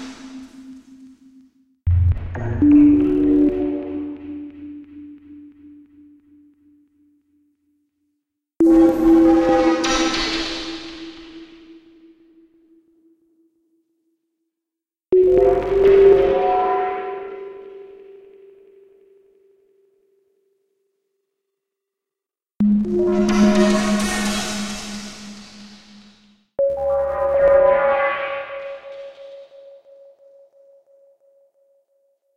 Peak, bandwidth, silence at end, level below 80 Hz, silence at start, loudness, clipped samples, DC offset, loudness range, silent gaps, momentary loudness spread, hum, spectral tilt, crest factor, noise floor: -2 dBFS; 13.5 kHz; 2.95 s; -42 dBFS; 0 s; -17 LUFS; under 0.1%; under 0.1%; 14 LU; none; 25 LU; none; -6 dB/octave; 18 dB; -89 dBFS